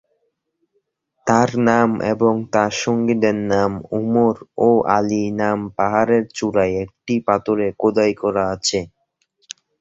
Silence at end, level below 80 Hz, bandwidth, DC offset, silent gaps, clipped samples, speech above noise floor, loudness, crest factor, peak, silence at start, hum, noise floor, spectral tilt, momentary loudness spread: 0.95 s; -52 dBFS; 7.8 kHz; under 0.1%; none; under 0.1%; 52 dB; -18 LUFS; 18 dB; 0 dBFS; 1.25 s; none; -70 dBFS; -5.5 dB/octave; 7 LU